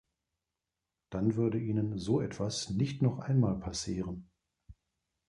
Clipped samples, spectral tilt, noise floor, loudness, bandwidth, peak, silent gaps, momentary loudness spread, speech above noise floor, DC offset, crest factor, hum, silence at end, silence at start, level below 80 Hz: under 0.1%; -6.5 dB/octave; -89 dBFS; -33 LUFS; 11.5 kHz; -16 dBFS; none; 8 LU; 57 dB; under 0.1%; 16 dB; none; 0.55 s; 1.1 s; -56 dBFS